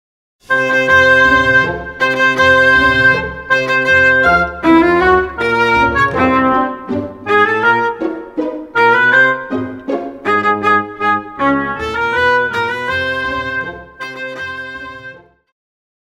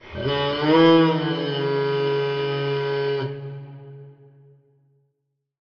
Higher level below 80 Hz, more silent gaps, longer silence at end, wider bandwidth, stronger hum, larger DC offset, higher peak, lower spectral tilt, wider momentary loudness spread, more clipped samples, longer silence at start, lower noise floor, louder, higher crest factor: first, -38 dBFS vs -58 dBFS; neither; second, 0.9 s vs 1.5 s; first, 16.5 kHz vs 6.6 kHz; neither; neither; first, 0 dBFS vs -6 dBFS; about the same, -5 dB/octave vs -4.5 dB/octave; second, 13 LU vs 20 LU; neither; first, 0.5 s vs 0.05 s; second, -36 dBFS vs -76 dBFS; first, -12 LUFS vs -21 LUFS; about the same, 14 dB vs 16 dB